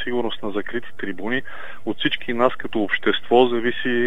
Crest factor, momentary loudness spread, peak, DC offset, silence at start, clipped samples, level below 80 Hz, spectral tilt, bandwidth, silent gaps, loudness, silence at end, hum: 20 dB; 13 LU; 0 dBFS; 5%; 0 s; under 0.1%; -56 dBFS; -6.5 dB/octave; 7.6 kHz; none; -22 LUFS; 0 s; none